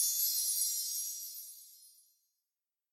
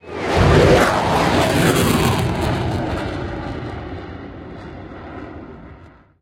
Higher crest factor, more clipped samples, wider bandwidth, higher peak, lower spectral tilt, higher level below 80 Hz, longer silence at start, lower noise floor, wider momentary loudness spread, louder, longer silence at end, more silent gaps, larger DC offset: about the same, 18 dB vs 18 dB; neither; about the same, 16.5 kHz vs 16.5 kHz; second, -20 dBFS vs -2 dBFS; second, 11 dB/octave vs -5.5 dB/octave; second, under -90 dBFS vs -32 dBFS; about the same, 0 s vs 0.05 s; first, under -90 dBFS vs -44 dBFS; second, 18 LU vs 21 LU; second, -32 LUFS vs -17 LUFS; first, 1.05 s vs 0.35 s; neither; neither